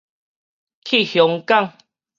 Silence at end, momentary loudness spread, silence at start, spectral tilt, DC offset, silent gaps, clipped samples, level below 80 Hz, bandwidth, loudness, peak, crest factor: 0.5 s; 13 LU; 0.85 s; -5 dB/octave; under 0.1%; none; under 0.1%; -74 dBFS; 7.4 kHz; -17 LUFS; -2 dBFS; 20 dB